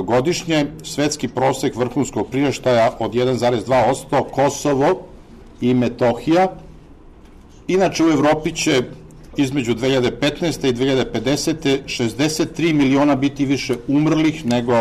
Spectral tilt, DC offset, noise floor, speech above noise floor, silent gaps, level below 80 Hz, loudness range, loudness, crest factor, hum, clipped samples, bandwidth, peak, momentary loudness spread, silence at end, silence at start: -5 dB/octave; under 0.1%; -42 dBFS; 25 dB; none; -44 dBFS; 2 LU; -18 LUFS; 10 dB; none; under 0.1%; 13.5 kHz; -8 dBFS; 5 LU; 0 s; 0 s